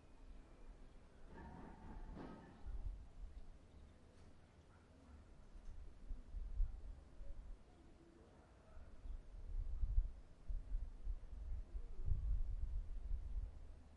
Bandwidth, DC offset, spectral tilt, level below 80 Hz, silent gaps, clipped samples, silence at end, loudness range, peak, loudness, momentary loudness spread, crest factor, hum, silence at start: 5.2 kHz; under 0.1%; -8 dB/octave; -48 dBFS; none; under 0.1%; 0 s; 10 LU; -26 dBFS; -52 LUFS; 19 LU; 22 dB; none; 0 s